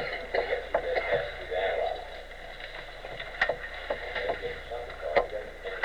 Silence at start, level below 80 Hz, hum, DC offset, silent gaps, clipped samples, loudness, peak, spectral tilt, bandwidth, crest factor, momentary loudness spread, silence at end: 0 s; -48 dBFS; none; 0.2%; none; under 0.1%; -32 LUFS; -12 dBFS; -4.5 dB/octave; 15.5 kHz; 20 dB; 12 LU; 0 s